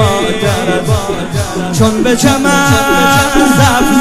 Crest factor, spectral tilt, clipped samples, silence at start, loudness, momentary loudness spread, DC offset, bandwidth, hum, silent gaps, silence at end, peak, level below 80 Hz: 10 dB; -4.5 dB/octave; 0.2%; 0 s; -10 LUFS; 7 LU; under 0.1%; 16 kHz; none; none; 0 s; 0 dBFS; -28 dBFS